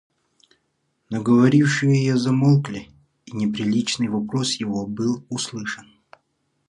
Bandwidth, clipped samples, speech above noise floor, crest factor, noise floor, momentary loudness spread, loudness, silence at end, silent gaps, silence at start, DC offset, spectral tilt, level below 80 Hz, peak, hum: 11 kHz; under 0.1%; 51 dB; 18 dB; -71 dBFS; 15 LU; -21 LUFS; 0.85 s; none; 1.1 s; under 0.1%; -5.5 dB/octave; -60 dBFS; -4 dBFS; none